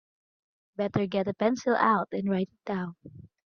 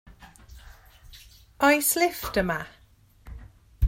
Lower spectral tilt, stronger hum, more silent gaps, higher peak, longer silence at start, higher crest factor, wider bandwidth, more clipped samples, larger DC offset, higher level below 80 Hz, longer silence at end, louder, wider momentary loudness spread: first, -6.5 dB/octave vs -4 dB/octave; neither; neither; second, -10 dBFS vs -6 dBFS; first, 0.8 s vs 0.05 s; about the same, 20 dB vs 22 dB; second, 7 kHz vs 16.5 kHz; neither; neither; second, -66 dBFS vs -48 dBFS; first, 0.2 s vs 0 s; second, -28 LUFS vs -24 LUFS; second, 10 LU vs 27 LU